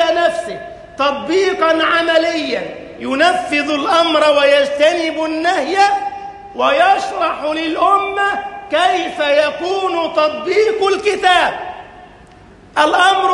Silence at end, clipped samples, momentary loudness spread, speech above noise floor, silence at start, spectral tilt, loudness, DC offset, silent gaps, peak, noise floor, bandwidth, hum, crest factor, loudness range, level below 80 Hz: 0 s; under 0.1%; 11 LU; 27 dB; 0 s; -2.5 dB/octave; -14 LUFS; under 0.1%; none; 0 dBFS; -42 dBFS; 11.5 kHz; none; 14 dB; 2 LU; -52 dBFS